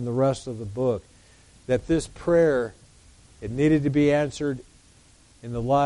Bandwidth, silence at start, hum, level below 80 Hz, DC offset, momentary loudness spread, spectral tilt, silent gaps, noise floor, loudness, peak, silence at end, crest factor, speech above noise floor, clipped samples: 11.5 kHz; 0 s; none; -48 dBFS; under 0.1%; 14 LU; -7 dB/octave; none; -55 dBFS; -24 LUFS; -10 dBFS; 0 s; 14 dB; 32 dB; under 0.1%